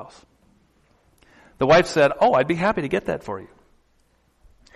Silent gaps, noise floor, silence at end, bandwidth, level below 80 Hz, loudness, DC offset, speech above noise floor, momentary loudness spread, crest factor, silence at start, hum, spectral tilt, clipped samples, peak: none; -63 dBFS; 1.3 s; 12.5 kHz; -52 dBFS; -20 LUFS; under 0.1%; 43 dB; 14 LU; 16 dB; 0 s; none; -5.5 dB/octave; under 0.1%; -6 dBFS